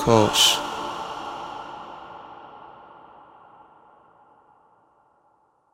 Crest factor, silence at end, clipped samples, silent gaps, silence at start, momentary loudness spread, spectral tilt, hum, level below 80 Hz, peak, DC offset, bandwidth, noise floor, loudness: 26 dB; 2.75 s; under 0.1%; none; 0 s; 27 LU; -3 dB/octave; none; -54 dBFS; 0 dBFS; under 0.1%; 16 kHz; -63 dBFS; -21 LUFS